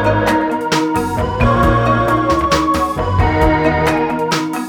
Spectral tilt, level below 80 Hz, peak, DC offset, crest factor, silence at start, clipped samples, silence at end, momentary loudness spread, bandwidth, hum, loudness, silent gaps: -6 dB/octave; -26 dBFS; -4 dBFS; under 0.1%; 12 dB; 0 s; under 0.1%; 0 s; 4 LU; 19 kHz; none; -15 LUFS; none